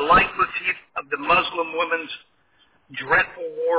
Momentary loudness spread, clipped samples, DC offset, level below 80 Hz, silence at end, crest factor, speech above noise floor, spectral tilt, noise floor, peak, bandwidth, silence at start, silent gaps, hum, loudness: 16 LU; under 0.1%; under 0.1%; -48 dBFS; 0 s; 18 dB; 39 dB; -7.5 dB/octave; -61 dBFS; -4 dBFS; 4 kHz; 0 s; none; none; -21 LUFS